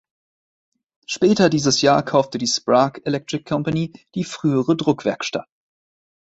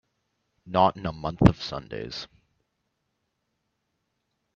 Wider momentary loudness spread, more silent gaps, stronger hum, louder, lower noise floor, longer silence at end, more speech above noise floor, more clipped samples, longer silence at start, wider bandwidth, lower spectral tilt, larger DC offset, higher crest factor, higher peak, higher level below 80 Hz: second, 11 LU vs 15 LU; neither; neither; first, -19 LUFS vs -25 LUFS; first, under -90 dBFS vs -78 dBFS; second, 1 s vs 2.3 s; first, over 71 dB vs 53 dB; neither; first, 1.1 s vs 0.65 s; about the same, 8.2 kHz vs 7.8 kHz; second, -5 dB/octave vs -7.5 dB/octave; neither; second, 20 dB vs 28 dB; about the same, -2 dBFS vs 0 dBFS; second, -58 dBFS vs -44 dBFS